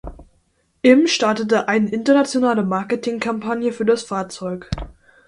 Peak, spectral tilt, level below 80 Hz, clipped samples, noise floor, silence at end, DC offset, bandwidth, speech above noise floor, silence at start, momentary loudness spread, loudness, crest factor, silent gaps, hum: 0 dBFS; -5 dB/octave; -42 dBFS; under 0.1%; -63 dBFS; 0.35 s; under 0.1%; 11.5 kHz; 45 dB; 0.05 s; 14 LU; -19 LUFS; 18 dB; none; none